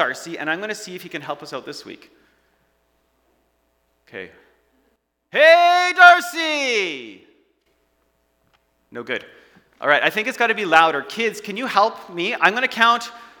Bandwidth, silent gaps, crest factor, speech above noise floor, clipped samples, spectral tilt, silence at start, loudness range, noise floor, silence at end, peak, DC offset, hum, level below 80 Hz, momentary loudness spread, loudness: 19.5 kHz; none; 20 dB; 48 dB; under 0.1%; -2.5 dB/octave; 0 s; 18 LU; -67 dBFS; 0.2 s; 0 dBFS; under 0.1%; none; -70 dBFS; 23 LU; -17 LUFS